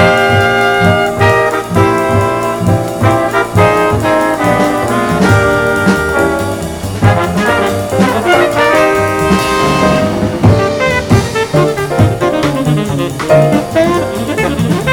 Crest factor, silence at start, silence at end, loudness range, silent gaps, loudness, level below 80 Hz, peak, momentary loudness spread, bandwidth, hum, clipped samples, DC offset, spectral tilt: 10 dB; 0 s; 0 s; 1 LU; none; -11 LUFS; -32 dBFS; 0 dBFS; 4 LU; 19 kHz; none; 0.3%; under 0.1%; -6 dB/octave